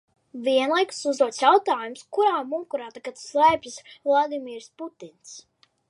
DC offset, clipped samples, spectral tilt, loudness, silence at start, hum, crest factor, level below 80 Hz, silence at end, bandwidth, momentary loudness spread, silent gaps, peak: under 0.1%; under 0.1%; -2.5 dB/octave; -23 LUFS; 0.35 s; none; 20 dB; -68 dBFS; 0.5 s; 11.5 kHz; 20 LU; none; -4 dBFS